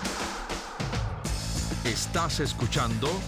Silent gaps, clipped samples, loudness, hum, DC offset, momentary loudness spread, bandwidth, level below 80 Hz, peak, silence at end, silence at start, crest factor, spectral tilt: none; under 0.1%; -30 LUFS; none; under 0.1%; 6 LU; 19 kHz; -38 dBFS; -14 dBFS; 0 s; 0 s; 16 dB; -4 dB/octave